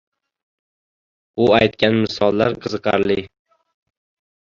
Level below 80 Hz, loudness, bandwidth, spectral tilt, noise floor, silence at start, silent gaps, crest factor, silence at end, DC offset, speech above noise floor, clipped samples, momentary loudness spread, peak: -50 dBFS; -18 LUFS; 7.4 kHz; -6.5 dB/octave; under -90 dBFS; 1.35 s; none; 18 dB; 1.2 s; under 0.1%; over 73 dB; under 0.1%; 8 LU; -2 dBFS